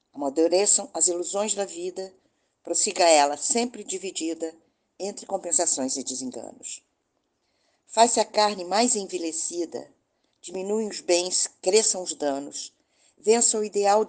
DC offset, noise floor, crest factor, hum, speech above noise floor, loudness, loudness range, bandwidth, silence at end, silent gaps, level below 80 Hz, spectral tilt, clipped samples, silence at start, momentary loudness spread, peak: under 0.1%; -75 dBFS; 22 dB; none; 50 dB; -24 LUFS; 5 LU; 10 kHz; 0 s; none; -76 dBFS; -1.5 dB/octave; under 0.1%; 0.15 s; 16 LU; -4 dBFS